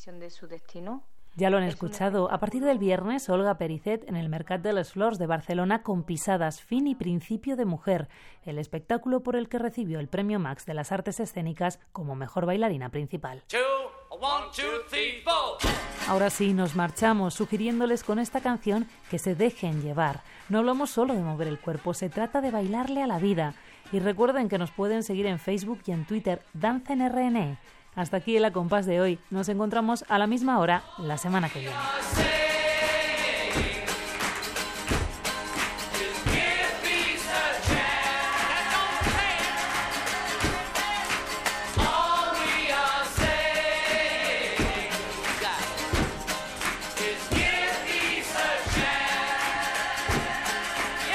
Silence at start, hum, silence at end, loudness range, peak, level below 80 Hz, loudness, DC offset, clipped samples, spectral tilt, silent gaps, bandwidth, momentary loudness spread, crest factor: 0 s; none; 0 s; 5 LU; -10 dBFS; -44 dBFS; -27 LUFS; under 0.1%; under 0.1%; -4 dB/octave; none; 16 kHz; 8 LU; 18 dB